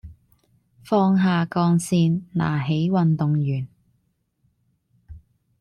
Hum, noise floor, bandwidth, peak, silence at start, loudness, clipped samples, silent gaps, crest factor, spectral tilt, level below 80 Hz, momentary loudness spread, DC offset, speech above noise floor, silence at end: none; -69 dBFS; 12.5 kHz; -8 dBFS; 0.05 s; -21 LUFS; under 0.1%; none; 16 dB; -7 dB/octave; -54 dBFS; 5 LU; under 0.1%; 49 dB; 0.45 s